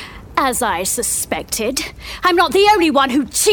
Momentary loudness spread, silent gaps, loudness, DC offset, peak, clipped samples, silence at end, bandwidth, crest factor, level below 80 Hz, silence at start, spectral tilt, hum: 9 LU; none; -16 LUFS; under 0.1%; -2 dBFS; under 0.1%; 0 s; over 20 kHz; 14 dB; -40 dBFS; 0 s; -2 dB/octave; none